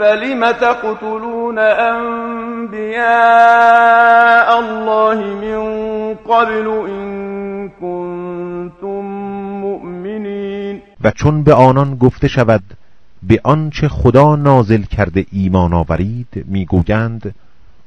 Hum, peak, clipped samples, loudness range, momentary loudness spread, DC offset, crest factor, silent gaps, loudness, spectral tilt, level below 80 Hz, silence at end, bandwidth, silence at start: none; 0 dBFS; 0.4%; 12 LU; 16 LU; under 0.1%; 14 dB; none; -13 LUFS; -8 dB/octave; -34 dBFS; 0.55 s; 8.8 kHz; 0 s